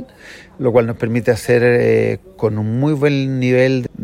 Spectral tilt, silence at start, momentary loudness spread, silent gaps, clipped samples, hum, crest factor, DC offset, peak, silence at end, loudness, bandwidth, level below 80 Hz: -7.5 dB/octave; 0 s; 8 LU; none; under 0.1%; none; 14 dB; under 0.1%; -2 dBFS; 0 s; -16 LUFS; 15 kHz; -48 dBFS